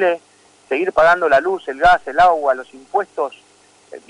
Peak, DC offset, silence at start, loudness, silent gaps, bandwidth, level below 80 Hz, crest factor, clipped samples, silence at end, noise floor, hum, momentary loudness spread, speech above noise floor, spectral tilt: -4 dBFS; under 0.1%; 0 s; -16 LUFS; none; 11 kHz; -46 dBFS; 12 dB; under 0.1%; 0.1 s; -49 dBFS; 50 Hz at -60 dBFS; 11 LU; 33 dB; -4.5 dB/octave